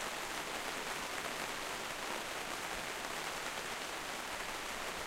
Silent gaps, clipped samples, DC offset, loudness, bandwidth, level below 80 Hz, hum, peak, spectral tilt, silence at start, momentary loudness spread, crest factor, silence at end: none; under 0.1%; under 0.1%; -40 LUFS; 16 kHz; -62 dBFS; none; -22 dBFS; -1 dB/octave; 0 s; 1 LU; 20 dB; 0 s